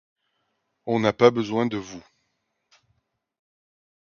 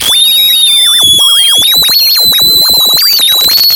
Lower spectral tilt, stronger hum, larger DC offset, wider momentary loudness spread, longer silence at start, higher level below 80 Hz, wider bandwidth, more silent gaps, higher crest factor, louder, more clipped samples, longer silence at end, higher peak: first, -6 dB/octave vs 1 dB/octave; neither; neither; first, 22 LU vs 1 LU; first, 0.85 s vs 0 s; second, -64 dBFS vs -42 dBFS; second, 7 kHz vs over 20 kHz; neither; first, 24 dB vs 6 dB; second, -22 LUFS vs -3 LUFS; second, under 0.1% vs 0.2%; first, 2.05 s vs 0 s; about the same, -2 dBFS vs 0 dBFS